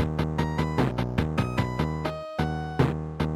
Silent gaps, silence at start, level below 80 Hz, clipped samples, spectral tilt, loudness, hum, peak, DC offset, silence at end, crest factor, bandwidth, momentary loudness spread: none; 0 s; -38 dBFS; under 0.1%; -7.5 dB/octave; -28 LUFS; none; -10 dBFS; under 0.1%; 0 s; 18 dB; 13.5 kHz; 4 LU